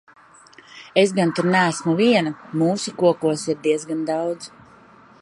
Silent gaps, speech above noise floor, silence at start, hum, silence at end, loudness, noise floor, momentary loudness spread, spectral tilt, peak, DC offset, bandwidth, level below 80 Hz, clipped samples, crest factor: none; 29 dB; 0.75 s; none; 0.75 s; -20 LUFS; -49 dBFS; 9 LU; -5 dB/octave; -2 dBFS; under 0.1%; 11.5 kHz; -68 dBFS; under 0.1%; 20 dB